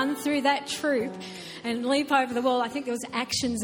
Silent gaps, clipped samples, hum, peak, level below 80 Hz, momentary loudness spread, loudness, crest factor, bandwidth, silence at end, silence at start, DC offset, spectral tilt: none; under 0.1%; none; -10 dBFS; -62 dBFS; 10 LU; -27 LUFS; 18 dB; 17.5 kHz; 0 s; 0 s; under 0.1%; -3 dB/octave